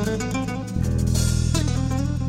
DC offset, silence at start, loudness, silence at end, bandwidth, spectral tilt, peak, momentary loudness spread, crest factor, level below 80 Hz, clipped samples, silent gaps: under 0.1%; 0 s; -23 LUFS; 0 s; 16 kHz; -5.5 dB/octave; -8 dBFS; 5 LU; 14 dB; -30 dBFS; under 0.1%; none